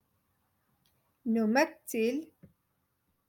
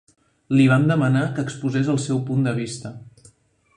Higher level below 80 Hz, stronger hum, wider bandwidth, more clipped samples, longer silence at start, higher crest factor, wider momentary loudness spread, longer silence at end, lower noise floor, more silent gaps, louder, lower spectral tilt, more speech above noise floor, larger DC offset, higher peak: second, -80 dBFS vs -58 dBFS; neither; first, 17.5 kHz vs 10.5 kHz; neither; first, 1.25 s vs 0.5 s; about the same, 20 dB vs 16 dB; about the same, 11 LU vs 12 LU; first, 1.05 s vs 0.65 s; first, -78 dBFS vs -57 dBFS; neither; second, -31 LUFS vs -21 LUFS; second, -5 dB/octave vs -7 dB/octave; first, 48 dB vs 37 dB; neither; second, -14 dBFS vs -4 dBFS